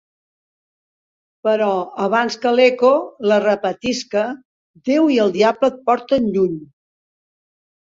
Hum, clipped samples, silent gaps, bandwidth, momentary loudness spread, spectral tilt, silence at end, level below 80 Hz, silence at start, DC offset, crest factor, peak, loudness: none; under 0.1%; 4.45-4.74 s; 7.8 kHz; 8 LU; -5 dB/octave; 1.2 s; -60 dBFS; 1.45 s; under 0.1%; 18 dB; -2 dBFS; -17 LUFS